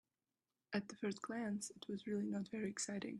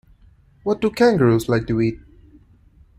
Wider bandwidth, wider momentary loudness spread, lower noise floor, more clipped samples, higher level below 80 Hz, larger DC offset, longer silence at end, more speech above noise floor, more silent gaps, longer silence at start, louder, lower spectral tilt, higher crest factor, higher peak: second, 12 kHz vs 15.5 kHz; second, 4 LU vs 11 LU; first, under -90 dBFS vs -52 dBFS; neither; second, -82 dBFS vs -46 dBFS; neither; second, 0 s vs 1 s; first, over 46 dB vs 34 dB; neither; about the same, 0.7 s vs 0.65 s; second, -44 LUFS vs -19 LUFS; second, -4.5 dB/octave vs -7 dB/octave; about the same, 20 dB vs 16 dB; second, -26 dBFS vs -4 dBFS